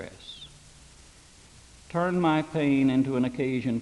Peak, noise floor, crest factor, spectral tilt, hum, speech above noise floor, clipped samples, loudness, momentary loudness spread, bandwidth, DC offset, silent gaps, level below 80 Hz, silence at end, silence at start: -12 dBFS; -53 dBFS; 16 dB; -7 dB/octave; none; 28 dB; under 0.1%; -26 LUFS; 19 LU; 11.5 kHz; under 0.1%; none; -58 dBFS; 0 s; 0 s